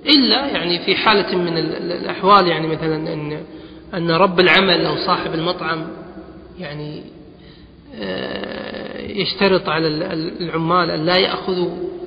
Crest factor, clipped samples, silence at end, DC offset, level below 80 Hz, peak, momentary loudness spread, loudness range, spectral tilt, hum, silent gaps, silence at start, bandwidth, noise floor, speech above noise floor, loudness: 18 dB; under 0.1%; 0 s; under 0.1%; -48 dBFS; 0 dBFS; 18 LU; 11 LU; -7.5 dB/octave; none; none; 0 s; 5.2 kHz; -42 dBFS; 24 dB; -17 LUFS